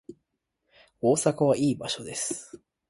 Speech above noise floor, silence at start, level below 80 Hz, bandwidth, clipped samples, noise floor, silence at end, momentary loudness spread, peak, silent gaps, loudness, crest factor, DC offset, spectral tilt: 54 dB; 0.1 s; -66 dBFS; 11.5 kHz; under 0.1%; -80 dBFS; 0.35 s; 8 LU; -10 dBFS; none; -26 LUFS; 20 dB; under 0.1%; -4.5 dB/octave